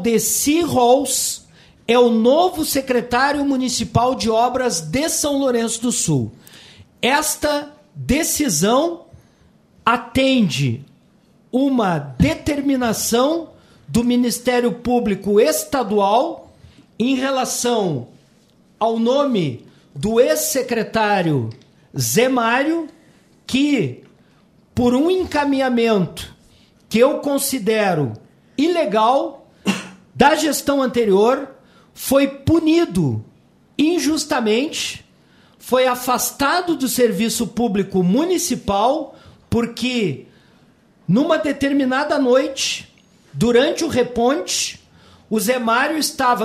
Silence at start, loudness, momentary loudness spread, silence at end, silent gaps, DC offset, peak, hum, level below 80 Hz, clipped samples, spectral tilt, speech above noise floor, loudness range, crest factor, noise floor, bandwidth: 0 s; -18 LUFS; 10 LU; 0 s; none; under 0.1%; 0 dBFS; none; -46 dBFS; under 0.1%; -4 dB/octave; 36 dB; 3 LU; 18 dB; -54 dBFS; 16 kHz